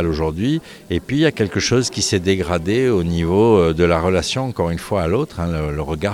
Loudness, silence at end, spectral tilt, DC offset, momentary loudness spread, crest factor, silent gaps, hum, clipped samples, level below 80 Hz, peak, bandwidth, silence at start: -18 LUFS; 0 s; -5.5 dB/octave; under 0.1%; 8 LU; 14 dB; none; none; under 0.1%; -36 dBFS; -2 dBFS; 17.5 kHz; 0 s